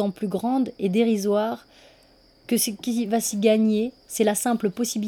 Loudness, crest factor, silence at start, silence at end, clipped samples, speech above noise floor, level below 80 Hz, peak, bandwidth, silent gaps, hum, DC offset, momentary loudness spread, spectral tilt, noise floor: -23 LUFS; 16 dB; 0 s; 0 s; under 0.1%; 33 dB; -64 dBFS; -6 dBFS; 18.5 kHz; none; none; under 0.1%; 6 LU; -4.5 dB/octave; -56 dBFS